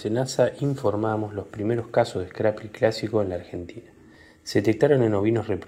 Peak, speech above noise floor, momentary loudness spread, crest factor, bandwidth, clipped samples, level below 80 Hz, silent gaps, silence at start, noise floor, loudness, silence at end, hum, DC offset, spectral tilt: -6 dBFS; 27 dB; 12 LU; 18 dB; 15 kHz; under 0.1%; -62 dBFS; none; 0 s; -51 dBFS; -24 LUFS; 0 s; none; under 0.1%; -6.5 dB/octave